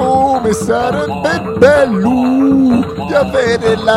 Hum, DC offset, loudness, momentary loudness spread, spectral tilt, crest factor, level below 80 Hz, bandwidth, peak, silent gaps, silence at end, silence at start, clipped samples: none; under 0.1%; -12 LUFS; 6 LU; -6 dB/octave; 12 dB; -38 dBFS; 13 kHz; 0 dBFS; none; 0 s; 0 s; under 0.1%